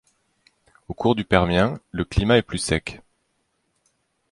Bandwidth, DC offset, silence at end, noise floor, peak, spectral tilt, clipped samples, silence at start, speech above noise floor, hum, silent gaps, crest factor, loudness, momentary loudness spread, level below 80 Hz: 11.5 kHz; under 0.1%; 1.35 s; -71 dBFS; -2 dBFS; -5.5 dB/octave; under 0.1%; 0.9 s; 50 dB; none; none; 22 dB; -21 LUFS; 10 LU; -38 dBFS